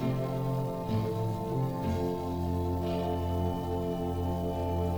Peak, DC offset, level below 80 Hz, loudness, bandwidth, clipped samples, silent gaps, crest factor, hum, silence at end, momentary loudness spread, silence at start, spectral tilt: -18 dBFS; under 0.1%; -48 dBFS; -32 LUFS; over 20 kHz; under 0.1%; none; 12 dB; none; 0 s; 1 LU; 0 s; -8.5 dB/octave